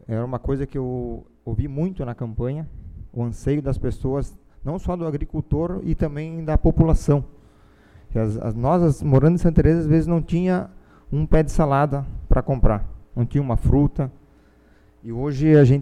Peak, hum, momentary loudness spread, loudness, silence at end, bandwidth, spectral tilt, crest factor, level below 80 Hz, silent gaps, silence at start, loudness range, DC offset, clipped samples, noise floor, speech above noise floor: -4 dBFS; none; 13 LU; -22 LUFS; 0 s; 11 kHz; -9 dB/octave; 18 dB; -28 dBFS; none; 0.1 s; 8 LU; under 0.1%; under 0.1%; -53 dBFS; 34 dB